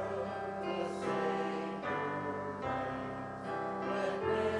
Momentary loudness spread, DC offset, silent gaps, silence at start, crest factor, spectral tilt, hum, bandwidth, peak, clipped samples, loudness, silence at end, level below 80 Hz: 5 LU; under 0.1%; none; 0 s; 14 dB; -6 dB/octave; none; 11.5 kHz; -22 dBFS; under 0.1%; -37 LUFS; 0 s; -66 dBFS